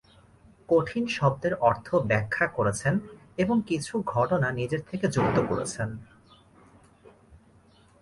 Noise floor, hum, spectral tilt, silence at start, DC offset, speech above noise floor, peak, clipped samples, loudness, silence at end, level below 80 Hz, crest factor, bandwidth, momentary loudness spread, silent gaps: -58 dBFS; none; -6 dB/octave; 0.7 s; under 0.1%; 32 dB; -8 dBFS; under 0.1%; -27 LUFS; 2 s; -54 dBFS; 20 dB; 11.5 kHz; 7 LU; none